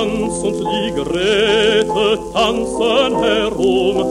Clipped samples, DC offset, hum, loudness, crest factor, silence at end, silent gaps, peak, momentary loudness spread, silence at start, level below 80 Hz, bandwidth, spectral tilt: under 0.1%; under 0.1%; none; -16 LUFS; 14 dB; 0 s; none; -2 dBFS; 6 LU; 0 s; -38 dBFS; 12.5 kHz; -4 dB/octave